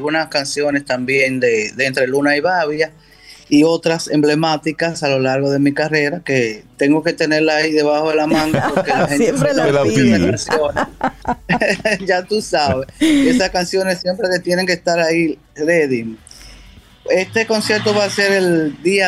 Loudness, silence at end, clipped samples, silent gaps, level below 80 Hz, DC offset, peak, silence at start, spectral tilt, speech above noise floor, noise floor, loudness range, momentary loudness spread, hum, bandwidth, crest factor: -16 LUFS; 0 s; under 0.1%; none; -46 dBFS; under 0.1%; -2 dBFS; 0 s; -5 dB/octave; 27 dB; -42 dBFS; 3 LU; 6 LU; none; 14 kHz; 12 dB